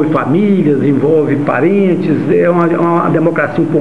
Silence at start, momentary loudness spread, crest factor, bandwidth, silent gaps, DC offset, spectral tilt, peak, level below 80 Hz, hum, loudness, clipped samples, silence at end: 0 s; 2 LU; 10 dB; 9.2 kHz; none; 2%; -9.5 dB/octave; 0 dBFS; -52 dBFS; none; -11 LUFS; under 0.1%; 0 s